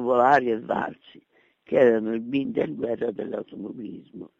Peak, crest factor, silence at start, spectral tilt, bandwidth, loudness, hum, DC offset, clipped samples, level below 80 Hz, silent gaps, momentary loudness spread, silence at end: -6 dBFS; 18 dB; 0 s; -4.5 dB/octave; 7.6 kHz; -24 LUFS; none; under 0.1%; under 0.1%; -66 dBFS; none; 17 LU; 0.1 s